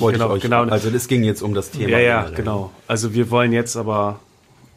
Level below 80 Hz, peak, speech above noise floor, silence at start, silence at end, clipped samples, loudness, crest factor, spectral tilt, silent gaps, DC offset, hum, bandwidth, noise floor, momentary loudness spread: -46 dBFS; -2 dBFS; 33 dB; 0 s; 0.6 s; under 0.1%; -19 LUFS; 16 dB; -5.5 dB/octave; none; under 0.1%; none; 15.5 kHz; -51 dBFS; 8 LU